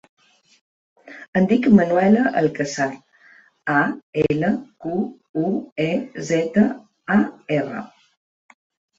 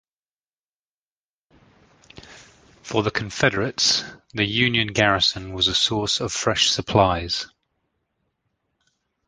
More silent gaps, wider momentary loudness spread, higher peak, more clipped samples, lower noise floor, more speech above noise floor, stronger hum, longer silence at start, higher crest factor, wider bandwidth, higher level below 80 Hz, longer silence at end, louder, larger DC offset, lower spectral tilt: first, 1.28-1.33 s, 4.03-4.13 s, 5.29-5.34 s, 5.72-5.76 s vs none; first, 12 LU vs 7 LU; about the same, -2 dBFS vs -2 dBFS; neither; second, -52 dBFS vs under -90 dBFS; second, 33 dB vs over 68 dB; neither; second, 1.05 s vs 2.15 s; about the same, 20 dB vs 24 dB; second, 7.8 kHz vs 10.5 kHz; second, -56 dBFS vs -48 dBFS; second, 1.1 s vs 1.8 s; about the same, -20 LUFS vs -20 LUFS; neither; first, -6.5 dB/octave vs -3 dB/octave